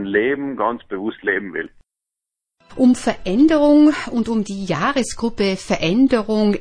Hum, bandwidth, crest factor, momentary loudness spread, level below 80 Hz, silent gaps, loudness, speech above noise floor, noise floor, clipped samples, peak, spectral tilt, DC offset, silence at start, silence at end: none; 10.5 kHz; 16 dB; 11 LU; -44 dBFS; none; -18 LUFS; 67 dB; -84 dBFS; under 0.1%; -2 dBFS; -5.5 dB/octave; under 0.1%; 0 s; 0 s